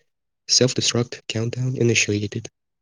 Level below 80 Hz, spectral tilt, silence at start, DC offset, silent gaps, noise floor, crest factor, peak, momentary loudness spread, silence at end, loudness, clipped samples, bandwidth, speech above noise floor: -64 dBFS; -3.5 dB/octave; 0.5 s; under 0.1%; none; -45 dBFS; 20 dB; -4 dBFS; 12 LU; 0.35 s; -20 LUFS; under 0.1%; 10.5 kHz; 24 dB